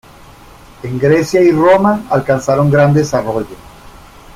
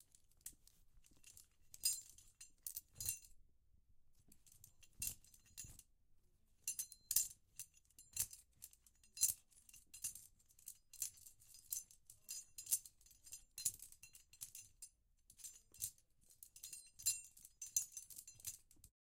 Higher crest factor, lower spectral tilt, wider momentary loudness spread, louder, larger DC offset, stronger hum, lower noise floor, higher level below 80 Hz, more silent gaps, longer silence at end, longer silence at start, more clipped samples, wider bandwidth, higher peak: second, 12 dB vs 32 dB; first, -7 dB/octave vs 1.5 dB/octave; second, 12 LU vs 22 LU; first, -12 LUFS vs -45 LUFS; neither; neither; second, -38 dBFS vs -73 dBFS; first, -42 dBFS vs -74 dBFS; neither; first, 0.8 s vs 0.15 s; first, 0.85 s vs 0.45 s; neither; about the same, 15.5 kHz vs 17 kHz; first, 0 dBFS vs -18 dBFS